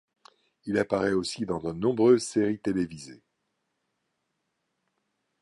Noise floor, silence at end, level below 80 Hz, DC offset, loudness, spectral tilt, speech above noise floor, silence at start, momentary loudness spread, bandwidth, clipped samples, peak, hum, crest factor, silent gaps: -79 dBFS; 2.25 s; -60 dBFS; under 0.1%; -27 LUFS; -5.5 dB/octave; 53 dB; 0.65 s; 15 LU; 11.5 kHz; under 0.1%; -8 dBFS; none; 20 dB; none